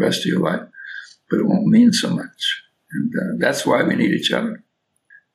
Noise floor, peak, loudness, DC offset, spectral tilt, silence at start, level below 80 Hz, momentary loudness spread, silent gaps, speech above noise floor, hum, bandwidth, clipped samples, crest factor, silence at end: -57 dBFS; -4 dBFS; -19 LUFS; under 0.1%; -5 dB/octave; 0 s; -70 dBFS; 19 LU; none; 39 dB; none; 14 kHz; under 0.1%; 16 dB; 0.75 s